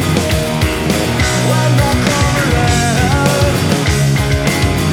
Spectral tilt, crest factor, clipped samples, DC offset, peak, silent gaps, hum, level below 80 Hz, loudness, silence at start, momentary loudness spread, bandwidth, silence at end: -5 dB/octave; 10 dB; under 0.1%; under 0.1%; -2 dBFS; none; none; -24 dBFS; -13 LUFS; 0 s; 2 LU; 18 kHz; 0 s